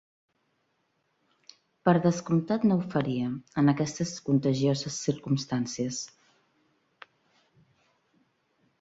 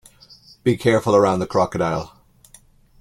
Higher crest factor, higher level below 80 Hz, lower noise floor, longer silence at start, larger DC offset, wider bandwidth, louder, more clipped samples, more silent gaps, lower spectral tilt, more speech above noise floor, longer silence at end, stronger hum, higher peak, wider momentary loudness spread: about the same, 22 dB vs 18 dB; second, -66 dBFS vs -50 dBFS; first, -74 dBFS vs -51 dBFS; first, 1.85 s vs 0.65 s; neither; second, 8 kHz vs 14.5 kHz; second, -28 LUFS vs -19 LUFS; neither; neither; about the same, -6 dB/octave vs -6.5 dB/octave; first, 48 dB vs 33 dB; first, 2.75 s vs 0.95 s; neither; second, -8 dBFS vs -2 dBFS; about the same, 8 LU vs 9 LU